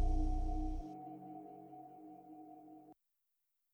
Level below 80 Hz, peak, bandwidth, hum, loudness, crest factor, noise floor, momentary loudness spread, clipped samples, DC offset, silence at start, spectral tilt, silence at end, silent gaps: -42 dBFS; -26 dBFS; 6 kHz; none; -46 LUFS; 16 dB; -85 dBFS; 18 LU; under 0.1%; under 0.1%; 0 s; -9 dB/octave; 0.8 s; none